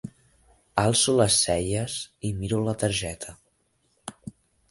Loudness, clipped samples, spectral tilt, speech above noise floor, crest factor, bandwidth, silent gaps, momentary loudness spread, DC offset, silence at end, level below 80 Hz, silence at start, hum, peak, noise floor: -24 LUFS; under 0.1%; -3.5 dB/octave; 45 dB; 22 dB; 12 kHz; none; 22 LU; under 0.1%; 0.4 s; -48 dBFS; 0.05 s; none; -6 dBFS; -69 dBFS